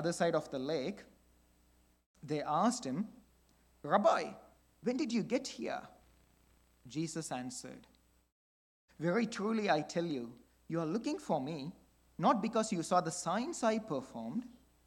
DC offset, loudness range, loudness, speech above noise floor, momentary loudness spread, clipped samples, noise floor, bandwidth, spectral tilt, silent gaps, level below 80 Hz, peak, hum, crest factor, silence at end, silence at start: under 0.1%; 6 LU; -36 LUFS; 34 dB; 13 LU; under 0.1%; -69 dBFS; 17 kHz; -5 dB/octave; 2.06-2.14 s, 8.32-8.88 s; -72 dBFS; -14 dBFS; none; 22 dB; 0.35 s; 0 s